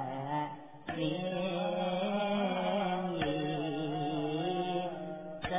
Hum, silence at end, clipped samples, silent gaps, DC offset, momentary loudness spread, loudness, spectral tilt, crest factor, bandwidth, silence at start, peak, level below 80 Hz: none; 0 s; under 0.1%; none; 0.1%; 8 LU; -35 LUFS; -4.5 dB/octave; 16 dB; 3.9 kHz; 0 s; -20 dBFS; -64 dBFS